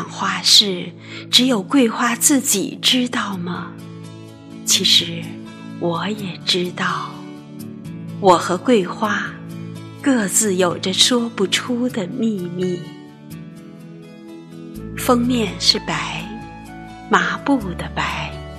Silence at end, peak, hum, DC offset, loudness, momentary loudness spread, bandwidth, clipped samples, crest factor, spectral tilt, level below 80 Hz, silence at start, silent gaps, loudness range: 0 s; 0 dBFS; none; under 0.1%; -17 LUFS; 22 LU; 14.5 kHz; under 0.1%; 20 dB; -3 dB/octave; -48 dBFS; 0 s; none; 7 LU